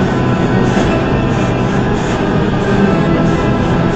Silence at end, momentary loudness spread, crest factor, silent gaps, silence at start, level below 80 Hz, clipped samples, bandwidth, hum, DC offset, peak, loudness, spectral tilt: 0 s; 2 LU; 12 dB; none; 0 s; -26 dBFS; under 0.1%; 8.4 kHz; none; under 0.1%; 0 dBFS; -13 LUFS; -7 dB/octave